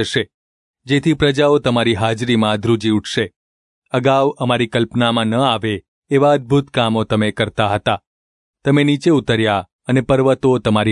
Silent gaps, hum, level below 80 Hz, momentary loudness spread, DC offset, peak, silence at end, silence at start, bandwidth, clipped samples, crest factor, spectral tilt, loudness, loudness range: 0.34-0.74 s, 3.36-3.82 s, 5.88-6.02 s, 8.07-8.54 s, 9.72-9.79 s; none; -48 dBFS; 7 LU; under 0.1%; -2 dBFS; 0 s; 0 s; 11 kHz; under 0.1%; 14 dB; -6 dB/octave; -16 LUFS; 1 LU